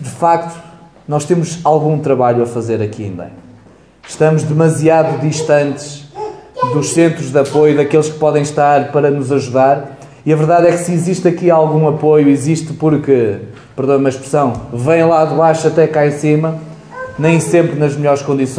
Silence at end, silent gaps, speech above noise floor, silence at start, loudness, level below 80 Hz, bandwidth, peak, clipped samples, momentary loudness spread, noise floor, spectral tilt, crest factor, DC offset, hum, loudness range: 0 s; none; 31 dB; 0 s; -13 LUFS; -50 dBFS; 11 kHz; 0 dBFS; under 0.1%; 15 LU; -43 dBFS; -6.5 dB/octave; 12 dB; under 0.1%; none; 3 LU